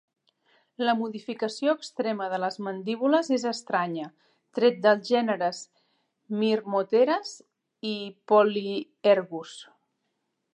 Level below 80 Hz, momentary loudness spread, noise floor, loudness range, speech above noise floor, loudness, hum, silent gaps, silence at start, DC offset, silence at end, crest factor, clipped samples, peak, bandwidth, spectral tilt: -84 dBFS; 15 LU; -78 dBFS; 2 LU; 53 dB; -26 LUFS; none; none; 0.8 s; under 0.1%; 0.9 s; 20 dB; under 0.1%; -8 dBFS; 10.5 kHz; -5 dB/octave